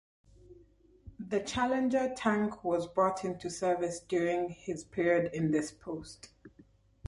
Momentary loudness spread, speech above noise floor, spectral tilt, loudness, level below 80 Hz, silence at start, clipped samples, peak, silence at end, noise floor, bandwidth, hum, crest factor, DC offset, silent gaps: 12 LU; 30 dB; -5.5 dB/octave; -32 LUFS; -60 dBFS; 0.5 s; under 0.1%; -14 dBFS; 0.6 s; -62 dBFS; 11.5 kHz; none; 18 dB; under 0.1%; none